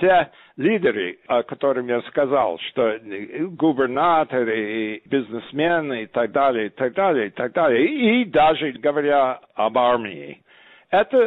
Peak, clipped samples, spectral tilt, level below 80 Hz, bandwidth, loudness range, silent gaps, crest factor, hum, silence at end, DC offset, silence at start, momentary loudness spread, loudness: -8 dBFS; under 0.1%; -8.5 dB/octave; -58 dBFS; 4.1 kHz; 3 LU; none; 12 dB; none; 0 s; under 0.1%; 0 s; 8 LU; -21 LUFS